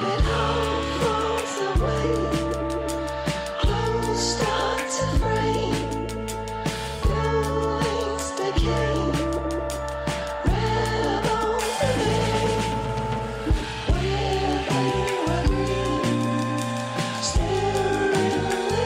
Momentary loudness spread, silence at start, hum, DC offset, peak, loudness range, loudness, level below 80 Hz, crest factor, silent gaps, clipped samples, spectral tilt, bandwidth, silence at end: 5 LU; 0 s; none; under 0.1%; -10 dBFS; 1 LU; -24 LUFS; -32 dBFS; 12 dB; none; under 0.1%; -5 dB/octave; 16 kHz; 0 s